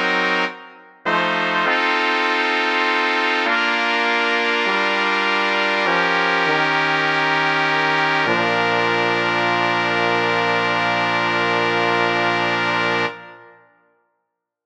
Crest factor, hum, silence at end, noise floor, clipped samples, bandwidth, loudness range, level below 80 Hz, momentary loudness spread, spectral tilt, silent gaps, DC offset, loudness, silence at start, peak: 18 dB; none; 1.25 s; -76 dBFS; under 0.1%; 10 kHz; 2 LU; -74 dBFS; 2 LU; -4 dB/octave; none; 0.1%; -17 LUFS; 0 s; -2 dBFS